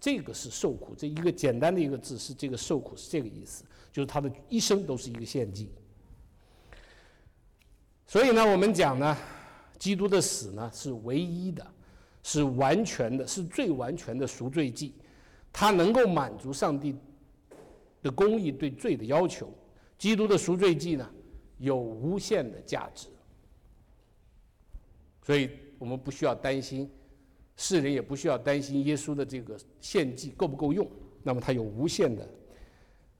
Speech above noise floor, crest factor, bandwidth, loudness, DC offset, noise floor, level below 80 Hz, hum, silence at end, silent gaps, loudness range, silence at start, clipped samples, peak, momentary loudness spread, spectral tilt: 32 dB; 16 dB; 17.5 kHz; -29 LUFS; under 0.1%; -61 dBFS; -56 dBFS; none; 0.55 s; none; 7 LU; 0 s; under 0.1%; -16 dBFS; 15 LU; -5 dB/octave